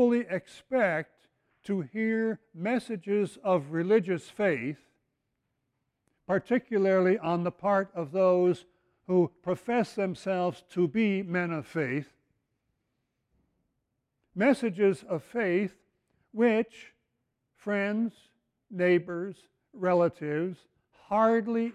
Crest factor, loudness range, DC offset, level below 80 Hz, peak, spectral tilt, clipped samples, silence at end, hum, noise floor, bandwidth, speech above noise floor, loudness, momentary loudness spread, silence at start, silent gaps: 18 dB; 5 LU; under 0.1%; -72 dBFS; -12 dBFS; -7.5 dB/octave; under 0.1%; 0 s; none; -81 dBFS; 11.5 kHz; 53 dB; -29 LUFS; 11 LU; 0 s; none